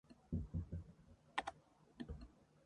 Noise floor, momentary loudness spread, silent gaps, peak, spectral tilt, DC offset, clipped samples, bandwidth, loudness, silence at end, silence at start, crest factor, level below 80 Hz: -68 dBFS; 18 LU; none; -22 dBFS; -6 dB/octave; under 0.1%; under 0.1%; 11 kHz; -49 LUFS; 0.25 s; 0.1 s; 28 dB; -56 dBFS